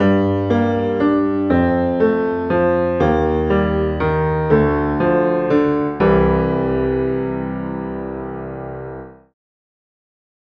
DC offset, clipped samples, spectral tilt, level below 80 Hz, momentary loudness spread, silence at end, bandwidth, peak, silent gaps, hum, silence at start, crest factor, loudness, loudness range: under 0.1%; under 0.1%; -9.5 dB/octave; -34 dBFS; 12 LU; 1.35 s; 6.2 kHz; -2 dBFS; none; none; 0 s; 16 dB; -17 LUFS; 7 LU